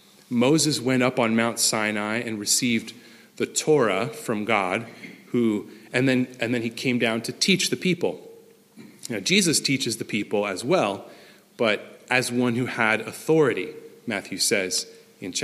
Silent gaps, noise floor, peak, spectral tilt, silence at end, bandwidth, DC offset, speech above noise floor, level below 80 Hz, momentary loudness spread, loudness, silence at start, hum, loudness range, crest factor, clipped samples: none; -50 dBFS; -4 dBFS; -3.5 dB/octave; 0 s; 15.5 kHz; under 0.1%; 26 dB; -70 dBFS; 10 LU; -23 LUFS; 0.3 s; none; 2 LU; 20 dB; under 0.1%